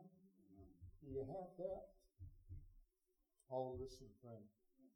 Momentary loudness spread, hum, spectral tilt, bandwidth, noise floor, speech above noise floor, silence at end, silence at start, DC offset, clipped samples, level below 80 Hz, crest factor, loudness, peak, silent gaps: 18 LU; none; -8 dB/octave; 19.5 kHz; -86 dBFS; 35 dB; 0.05 s; 0 s; under 0.1%; under 0.1%; -68 dBFS; 20 dB; -52 LUFS; -34 dBFS; none